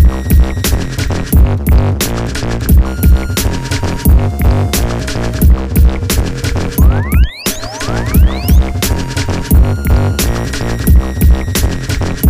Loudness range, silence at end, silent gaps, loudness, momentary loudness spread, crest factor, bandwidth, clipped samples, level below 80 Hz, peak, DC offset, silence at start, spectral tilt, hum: 1 LU; 0 s; none; -13 LUFS; 6 LU; 10 dB; 16 kHz; under 0.1%; -12 dBFS; 0 dBFS; 2%; 0 s; -5.5 dB/octave; none